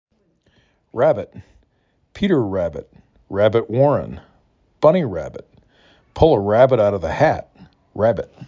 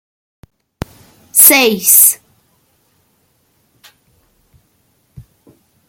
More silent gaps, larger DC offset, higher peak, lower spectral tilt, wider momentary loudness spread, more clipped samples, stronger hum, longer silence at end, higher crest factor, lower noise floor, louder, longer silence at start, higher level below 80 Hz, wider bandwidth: neither; neither; about the same, -2 dBFS vs 0 dBFS; first, -8 dB/octave vs -1 dB/octave; second, 20 LU vs 25 LU; second, under 0.1% vs 0.5%; neither; second, 0 s vs 0.7 s; about the same, 18 dB vs 16 dB; first, -64 dBFS vs -59 dBFS; second, -18 LUFS vs -7 LUFS; second, 0.95 s vs 1.35 s; first, -42 dBFS vs -50 dBFS; second, 7.4 kHz vs over 20 kHz